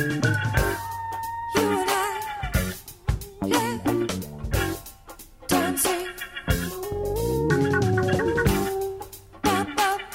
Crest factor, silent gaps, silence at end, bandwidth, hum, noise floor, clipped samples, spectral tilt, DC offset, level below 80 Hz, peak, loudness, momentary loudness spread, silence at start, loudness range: 16 dB; none; 0 s; 16.5 kHz; none; -45 dBFS; under 0.1%; -4.5 dB/octave; under 0.1%; -36 dBFS; -8 dBFS; -25 LUFS; 10 LU; 0 s; 3 LU